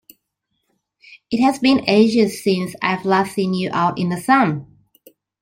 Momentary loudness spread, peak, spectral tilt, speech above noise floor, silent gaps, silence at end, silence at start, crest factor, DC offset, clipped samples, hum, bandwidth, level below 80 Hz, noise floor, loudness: 7 LU; -2 dBFS; -6 dB/octave; 56 dB; none; 0.8 s; 1.1 s; 18 dB; under 0.1%; under 0.1%; none; 16.5 kHz; -60 dBFS; -74 dBFS; -18 LUFS